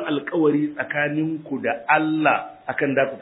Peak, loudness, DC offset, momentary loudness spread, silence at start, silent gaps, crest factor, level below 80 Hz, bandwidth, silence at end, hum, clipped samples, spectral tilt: -4 dBFS; -22 LUFS; under 0.1%; 7 LU; 0 s; none; 18 dB; -70 dBFS; 4 kHz; 0 s; none; under 0.1%; -10 dB/octave